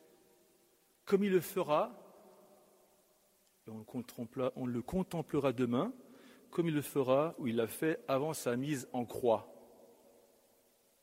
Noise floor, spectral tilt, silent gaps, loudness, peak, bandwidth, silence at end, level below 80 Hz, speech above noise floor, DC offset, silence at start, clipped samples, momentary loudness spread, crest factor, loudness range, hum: -71 dBFS; -6 dB/octave; none; -35 LUFS; -16 dBFS; 16 kHz; 1.35 s; -68 dBFS; 37 dB; under 0.1%; 1.05 s; under 0.1%; 13 LU; 20 dB; 6 LU; none